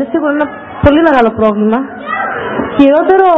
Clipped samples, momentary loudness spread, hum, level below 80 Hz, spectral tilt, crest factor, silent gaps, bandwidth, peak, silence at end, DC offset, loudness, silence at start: 0.8%; 9 LU; none; -32 dBFS; -8.5 dB/octave; 10 dB; none; 5.6 kHz; 0 dBFS; 0 s; under 0.1%; -11 LUFS; 0 s